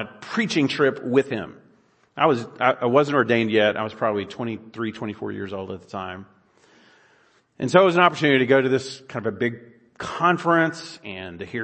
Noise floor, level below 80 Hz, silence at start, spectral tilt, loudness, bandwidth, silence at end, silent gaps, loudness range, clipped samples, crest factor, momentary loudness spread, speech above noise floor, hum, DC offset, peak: -60 dBFS; -66 dBFS; 0 s; -5.5 dB/octave; -22 LUFS; 8.8 kHz; 0 s; none; 10 LU; under 0.1%; 22 dB; 17 LU; 38 dB; none; under 0.1%; 0 dBFS